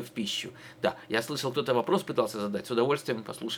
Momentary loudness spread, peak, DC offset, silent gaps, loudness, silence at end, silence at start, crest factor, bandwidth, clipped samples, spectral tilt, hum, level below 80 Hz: 7 LU; -10 dBFS; under 0.1%; none; -30 LUFS; 0 s; 0 s; 22 dB; over 20 kHz; under 0.1%; -4.5 dB/octave; none; -72 dBFS